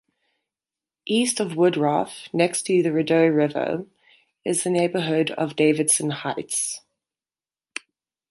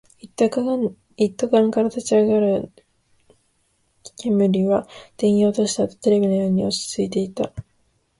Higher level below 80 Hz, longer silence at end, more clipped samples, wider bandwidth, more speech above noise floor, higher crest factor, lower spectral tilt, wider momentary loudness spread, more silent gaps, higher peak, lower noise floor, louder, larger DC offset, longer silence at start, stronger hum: second, -70 dBFS vs -56 dBFS; first, 1.5 s vs 0.6 s; neither; about the same, 12 kHz vs 11.5 kHz; first, over 68 dB vs 46 dB; about the same, 20 dB vs 16 dB; second, -4 dB/octave vs -6 dB/octave; first, 13 LU vs 10 LU; neither; about the same, -4 dBFS vs -4 dBFS; first, under -90 dBFS vs -66 dBFS; about the same, -22 LUFS vs -20 LUFS; neither; first, 1.05 s vs 0.25 s; neither